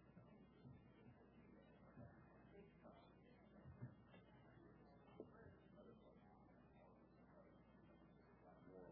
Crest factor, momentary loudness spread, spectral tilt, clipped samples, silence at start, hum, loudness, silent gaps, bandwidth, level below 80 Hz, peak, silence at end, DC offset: 22 dB; 7 LU; -6 dB/octave; under 0.1%; 0 s; none; -67 LUFS; none; 3.7 kHz; -80 dBFS; -44 dBFS; 0 s; under 0.1%